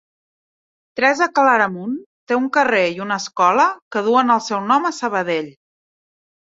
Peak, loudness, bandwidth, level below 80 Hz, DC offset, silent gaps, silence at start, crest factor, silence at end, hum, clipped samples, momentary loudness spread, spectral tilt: 0 dBFS; -17 LUFS; 7.8 kHz; -68 dBFS; under 0.1%; 2.06-2.27 s, 3.82-3.91 s; 0.95 s; 18 dB; 1 s; none; under 0.1%; 10 LU; -4 dB/octave